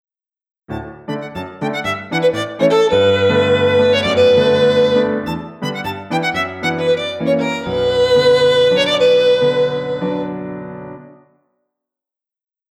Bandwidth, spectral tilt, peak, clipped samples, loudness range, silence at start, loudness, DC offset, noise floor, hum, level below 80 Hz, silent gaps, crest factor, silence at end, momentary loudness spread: 11.5 kHz; -5.5 dB/octave; -2 dBFS; under 0.1%; 5 LU; 0.7 s; -15 LUFS; under 0.1%; -88 dBFS; none; -50 dBFS; none; 14 dB; 1.65 s; 15 LU